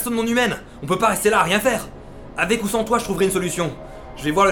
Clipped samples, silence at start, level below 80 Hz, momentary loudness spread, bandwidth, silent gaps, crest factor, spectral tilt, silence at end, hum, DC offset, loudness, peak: under 0.1%; 0 s; -42 dBFS; 16 LU; over 20 kHz; none; 16 dB; -4 dB/octave; 0 s; none; under 0.1%; -20 LUFS; -4 dBFS